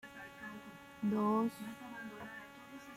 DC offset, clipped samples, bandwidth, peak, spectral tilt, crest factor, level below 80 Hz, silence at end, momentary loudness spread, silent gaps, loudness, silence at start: under 0.1%; under 0.1%; 16 kHz; -22 dBFS; -6.5 dB/octave; 18 dB; -76 dBFS; 0 s; 19 LU; none; -39 LUFS; 0.05 s